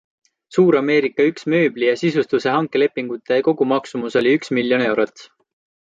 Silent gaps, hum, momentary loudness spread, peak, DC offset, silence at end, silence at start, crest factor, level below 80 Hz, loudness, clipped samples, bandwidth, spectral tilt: none; none; 6 LU; -4 dBFS; under 0.1%; 0.7 s; 0.5 s; 16 dB; -66 dBFS; -18 LUFS; under 0.1%; 7.8 kHz; -6.5 dB/octave